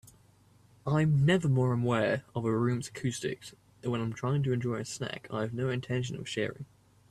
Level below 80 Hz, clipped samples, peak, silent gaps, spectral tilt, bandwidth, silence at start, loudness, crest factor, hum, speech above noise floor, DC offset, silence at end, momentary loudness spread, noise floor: -62 dBFS; under 0.1%; -14 dBFS; none; -6.5 dB/octave; 13 kHz; 0.85 s; -31 LUFS; 16 dB; none; 32 dB; under 0.1%; 0.45 s; 12 LU; -62 dBFS